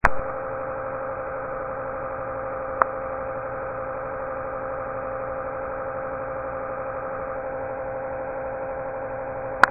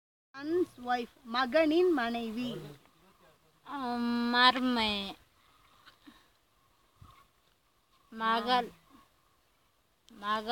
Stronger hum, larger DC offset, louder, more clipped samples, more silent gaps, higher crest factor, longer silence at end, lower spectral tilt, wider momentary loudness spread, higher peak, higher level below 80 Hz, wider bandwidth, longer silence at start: neither; neither; about the same, -29 LUFS vs -30 LUFS; neither; neither; about the same, 28 dB vs 26 dB; about the same, 0 s vs 0 s; second, 0.5 dB/octave vs -4.5 dB/octave; second, 6 LU vs 20 LU; first, 0 dBFS vs -8 dBFS; first, -44 dBFS vs -68 dBFS; second, 2.8 kHz vs 17 kHz; second, 0 s vs 0.35 s